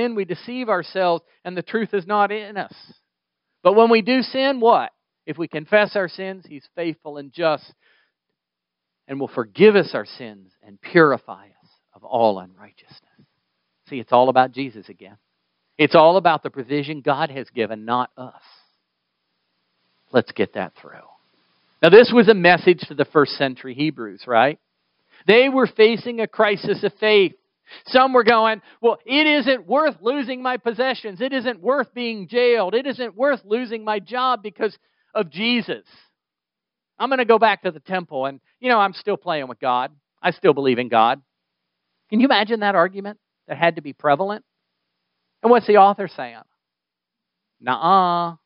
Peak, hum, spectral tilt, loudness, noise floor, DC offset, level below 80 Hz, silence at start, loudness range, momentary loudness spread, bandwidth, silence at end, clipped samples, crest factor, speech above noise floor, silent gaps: 0 dBFS; none; -3 dB/octave; -19 LUFS; -86 dBFS; under 0.1%; -72 dBFS; 0 s; 8 LU; 16 LU; 5.6 kHz; 0.1 s; under 0.1%; 20 dB; 67 dB; none